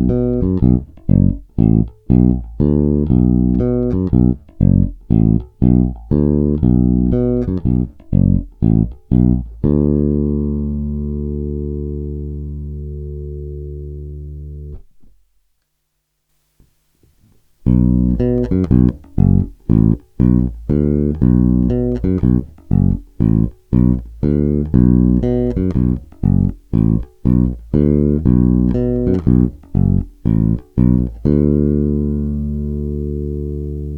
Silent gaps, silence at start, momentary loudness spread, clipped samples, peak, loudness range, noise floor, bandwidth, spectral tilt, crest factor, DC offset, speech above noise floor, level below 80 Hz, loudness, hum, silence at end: none; 0 s; 10 LU; under 0.1%; 0 dBFS; 10 LU; -70 dBFS; 3.2 kHz; -13 dB/octave; 16 dB; under 0.1%; 56 dB; -24 dBFS; -16 LUFS; none; 0 s